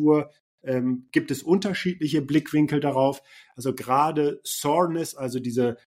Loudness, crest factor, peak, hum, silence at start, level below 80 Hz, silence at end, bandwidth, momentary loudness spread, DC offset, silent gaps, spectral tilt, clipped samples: -24 LUFS; 18 dB; -8 dBFS; none; 0 s; -66 dBFS; 0.15 s; 16 kHz; 8 LU; under 0.1%; 0.40-0.58 s; -5.5 dB/octave; under 0.1%